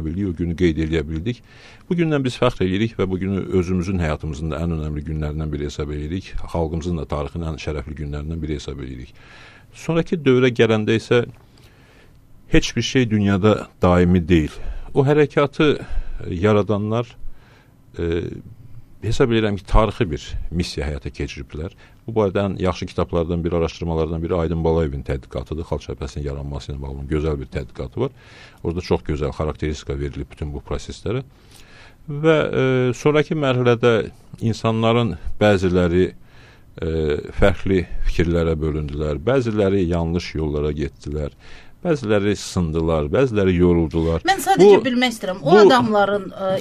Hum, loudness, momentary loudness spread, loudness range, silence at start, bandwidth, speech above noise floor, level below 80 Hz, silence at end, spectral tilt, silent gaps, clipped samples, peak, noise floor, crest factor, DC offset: none; -20 LUFS; 13 LU; 8 LU; 0 s; 14 kHz; 30 dB; -32 dBFS; 0 s; -6.5 dB/octave; none; under 0.1%; -2 dBFS; -49 dBFS; 18 dB; under 0.1%